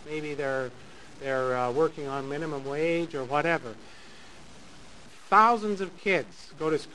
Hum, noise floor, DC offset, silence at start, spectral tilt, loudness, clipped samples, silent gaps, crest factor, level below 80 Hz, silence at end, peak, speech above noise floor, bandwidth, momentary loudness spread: none; -51 dBFS; 0.5%; 0 s; -5.5 dB/octave; -28 LUFS; under 0.1%; none; 22 dB; -62 dBFS; 0 s; -8 dBFS; 23 dB; 11.5 kHz; 21 LU